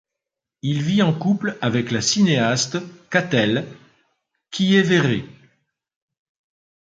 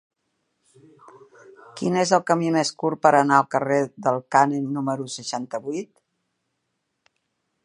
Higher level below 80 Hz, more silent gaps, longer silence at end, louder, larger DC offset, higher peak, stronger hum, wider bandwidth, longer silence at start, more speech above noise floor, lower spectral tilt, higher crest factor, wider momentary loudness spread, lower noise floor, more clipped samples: first, -60 dBFS vs -74 dBFS; neither; second, 1.6 s vs 1.8 s; about the same, -20 LUFS vs -22 LUFS; neither; about the same, -2 dBFS vs -2 dBFS; neither; second, 9.2 kHz vs 11.5 kHz; second, 0.65 s vs 1.75 s; first, 65 dB vs 54 dB; about the same, -4.5 dB/octave vs -5 dB/octave; about the same, 20 dB vs 22 dB; about the same, 10 LU vs 12 LU; first, -85 dBFS vs -77 dBFS; neither